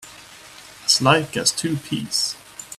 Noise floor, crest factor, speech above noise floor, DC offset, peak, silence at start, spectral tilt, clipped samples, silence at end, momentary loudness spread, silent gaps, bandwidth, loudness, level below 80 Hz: -43 dBFS; 22 dB; 22 dB; under 0.1%; -2 dBFS; 0 s; -3 dB/octave; under 0.1%; 0 s; 25 LU; none; 16 kHz; -20 LUFS; -58 dBFS